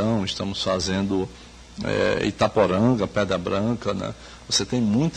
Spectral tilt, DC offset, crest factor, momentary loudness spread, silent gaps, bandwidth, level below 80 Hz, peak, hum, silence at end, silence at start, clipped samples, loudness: -5 dB/octave; under 0.1%; 18 dB; 11 LU; none; 10 kHz; -46 dBFS; -6 dBFS; none; 0 s; 0 s; under 0.1%; -23 LUFS